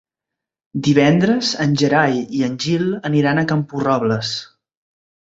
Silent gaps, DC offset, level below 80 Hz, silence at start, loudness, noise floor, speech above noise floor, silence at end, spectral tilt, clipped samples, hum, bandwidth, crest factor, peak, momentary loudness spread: none; under 0.1%; -56 dBFS; 0.75 s; -17 LUFS; -84 dBFS; 67 dB; 0.85 s; -6 dB/octave; under 0.1%; none; 8 kHz; 18 dB; 0 dBFS; 8 LU